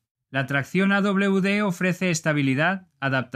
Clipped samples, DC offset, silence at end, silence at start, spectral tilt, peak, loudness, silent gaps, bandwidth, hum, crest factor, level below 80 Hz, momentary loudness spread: under 0.1%; under 0.1%; 0.1 s; 0.3 s; -5.5 dB/octave; -8 dBFS; -23 LUFS; none; 14 kHz; none; 16 dB; -68 dBFS; 5 LU